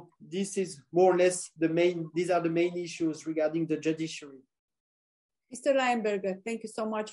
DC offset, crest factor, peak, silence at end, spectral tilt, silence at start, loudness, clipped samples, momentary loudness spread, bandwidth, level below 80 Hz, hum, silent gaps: under 0.1%; 18 dB; -12 dBFS; 0 s; -5 dB/octave; 0 s; -29 LUFS; under 0.1%; 10 LU; 11.5 kHz; -80 dBFS; none; 4.59-4.68 s, 4.80-5.29 s